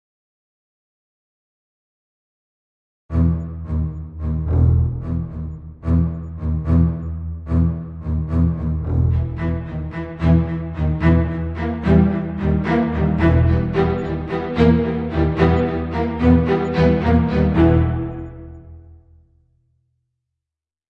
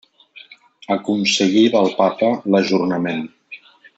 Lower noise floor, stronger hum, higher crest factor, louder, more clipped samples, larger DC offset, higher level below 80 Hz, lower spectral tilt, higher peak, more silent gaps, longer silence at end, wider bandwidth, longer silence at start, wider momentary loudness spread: first, -87 dBFS vs -45 dBFS; neither; about the same, 16 dB vs 16 dB; about the same, -19 LUFS vs -17 LUFS; neither; neither; first, -30 dBFS vs -66 dBFS; first, -10 dB/octave vs -4.5 dB/octave; about the same, -2 dBFS vs -2 dBFS; neither; first, 1.95 s vs 0.4 s; second, 5.4 kHz vs 8.2 kHz; first, 3.1 s vs 0.35 s; second, 12 LU vs 19 LU